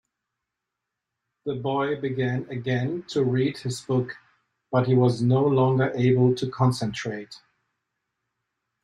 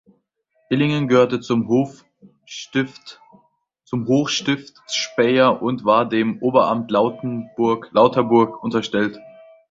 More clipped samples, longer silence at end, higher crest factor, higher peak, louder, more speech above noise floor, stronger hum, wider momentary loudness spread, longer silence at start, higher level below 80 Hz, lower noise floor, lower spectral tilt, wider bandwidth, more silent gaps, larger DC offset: neither; first, 1.45 s vs 0.4 s; about the same, 18 dB vs 18 dB; second, -8 dBFS vs -2 dBFS; second, -24 LUFS vs -19 LUFS; first, 61 dB vs 48 dB; neither; about the same, 13 LU vs 11 LU; first, 1.45 s vs 0.7 s; about the same, -62 dBFS vs -60 dBFS; first, -84 dBFS vs -66 dBFS; first, -7.5 dB/octave vs -5.5 dB/octave; first, 11.5 kHz vs 7.8 kHz; neither; neither